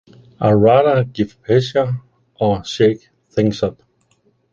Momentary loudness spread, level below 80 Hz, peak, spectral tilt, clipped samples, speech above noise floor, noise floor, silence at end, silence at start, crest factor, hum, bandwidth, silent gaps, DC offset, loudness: 12 LU; -46 dBFS; -2 dBFS; -7 dB/octave; under 0.1%; 45 dB; -60 dBFS; 0.8 s; 0.4 s; 16 dB; none; 7.6 kHz; none; under 0.1%; -17 LUFS